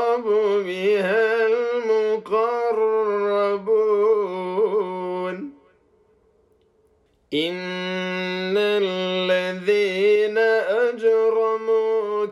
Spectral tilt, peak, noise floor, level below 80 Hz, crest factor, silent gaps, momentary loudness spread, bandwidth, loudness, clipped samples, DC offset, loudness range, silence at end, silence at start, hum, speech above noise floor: -5.5 dB/octave; -10 dBFS; -62 dBFS; -70 dBFS; 12 dB; none; 7 LU; 11 kHz; -21 LUFS; under 0.1%; under 0.1%; 9 LU; 0 s; 0 s; none; 41 dB